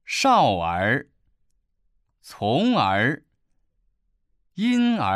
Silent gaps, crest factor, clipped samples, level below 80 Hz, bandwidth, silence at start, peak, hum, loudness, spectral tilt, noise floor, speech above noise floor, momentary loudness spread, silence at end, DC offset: none; 16 dB; under 0.1%; -58 dBFS; 13.5 kHz; 0.1 s; -8 dBFS; none; -21 LUFS; -5 dB/octave; -69 dBFS; 48 dB; 10 LU; 0 s; under 0.1%